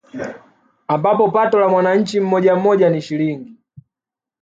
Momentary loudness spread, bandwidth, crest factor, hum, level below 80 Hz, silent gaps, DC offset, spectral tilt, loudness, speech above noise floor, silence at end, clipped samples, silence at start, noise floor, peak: 15 LU; 7.8 kHz; 14 dB; none; -64 dBFS; none; under 0.1%; -7 dB/octave; -16 LUFS; 72 dB; 0.9 s; under 0.1%; 0.15 s; -88 dBFS; -2 dBFS